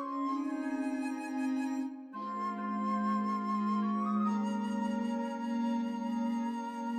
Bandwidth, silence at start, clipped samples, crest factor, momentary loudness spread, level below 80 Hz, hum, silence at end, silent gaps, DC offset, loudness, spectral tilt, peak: 9.8 kHz; 0 s; under 0.1%; 10 dB; 5 LU; -80 dBFS; none; 0 s; none; under 0.1%; -34 LUFS; -6.5 dB/octave; -22 dBFS